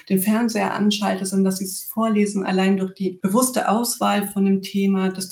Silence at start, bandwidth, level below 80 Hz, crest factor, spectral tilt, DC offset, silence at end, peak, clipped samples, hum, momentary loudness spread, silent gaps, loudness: 0.1 s; over 20 kHz; -66 dBFS; 16 dB; -5 dB/octave; under 0.1%; 0 s; -4 dBFS; under 0.1%; none; 4 LU; none; -21 LUFS